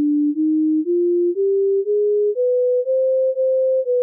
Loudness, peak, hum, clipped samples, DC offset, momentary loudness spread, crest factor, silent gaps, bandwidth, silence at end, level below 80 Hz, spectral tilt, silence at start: -18 LUFS; -14 dBFS; none; under 0.1%; under 0.1%; 1 LU; 4 dB; none; 0.6 kHz; 0 s; under -90 dBFS; -3.5 dB/octave; 0 s